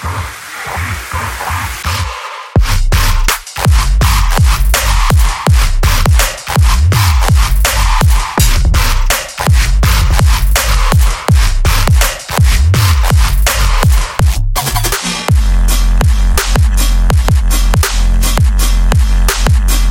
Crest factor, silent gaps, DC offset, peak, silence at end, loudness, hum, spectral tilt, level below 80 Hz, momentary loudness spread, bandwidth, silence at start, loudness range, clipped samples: 10 dB; none; under 0.1%; 0 dBFS; 0 s; -12 LUFS; none; -4 dB/octave; -10 dBFS; 6 LU; 17 kHz; 0 s; 2 LU; under 0.1%